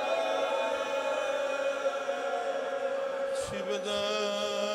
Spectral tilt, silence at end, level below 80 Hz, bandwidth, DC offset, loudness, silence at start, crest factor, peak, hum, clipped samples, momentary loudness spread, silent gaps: -2.5 dB/octave; 0 s; -68 dBFS; 14.5 kHz; under 0.1%; -31 LUFS; 0 s; 14 dB; -18 dBFS; none; under 0.1%; 3 LU; none